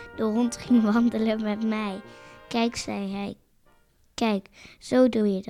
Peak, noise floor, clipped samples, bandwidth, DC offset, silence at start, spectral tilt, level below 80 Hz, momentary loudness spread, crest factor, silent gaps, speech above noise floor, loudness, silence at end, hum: -8 dBFS; -61 dBFS; under 0.1%; 11.5 kHz; under 0.1%; 0 s; -5.5 dB/octave; -58 dBFS; 15 LU; 18 dB; none; 36 dB; -25 LUFS; 0 s; none